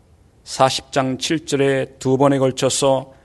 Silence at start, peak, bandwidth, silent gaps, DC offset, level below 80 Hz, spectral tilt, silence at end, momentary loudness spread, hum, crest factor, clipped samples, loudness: 0.45 s; 0 dBFS; 12 kHz; none; under 0.1%; -54 dBFS; -4.5 dB/octave; 0.2 s; 5 LU; none; 18 dB; under 0.1%; -18 LUFS